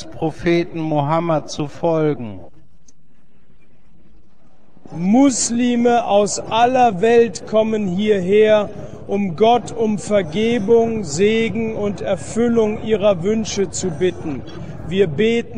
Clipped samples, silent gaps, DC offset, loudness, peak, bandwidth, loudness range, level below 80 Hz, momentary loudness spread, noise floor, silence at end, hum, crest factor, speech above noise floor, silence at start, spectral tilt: under 0.1%; none; 2%; -17 LUFS; -4 dBFS; 10 kHz; 7 LU; -46 dBFS; 10 LU; -57 dBFS; 0 s; none; 14 dB; 40 dB; 0 s; -5 dB/octave